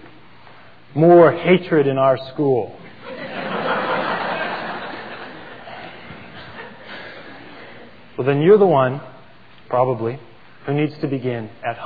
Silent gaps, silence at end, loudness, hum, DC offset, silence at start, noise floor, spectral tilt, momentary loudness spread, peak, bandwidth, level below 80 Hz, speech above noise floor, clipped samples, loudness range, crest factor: none; 0 s; -18 LUFS; none; 0.6%; 0 s; -47 dBFS; -10 dB/octave; 24 LU; -2 dBFS; 5 kHz; -62 dBFS; 31 dB; under 0.1%; 14 LU; 18 dB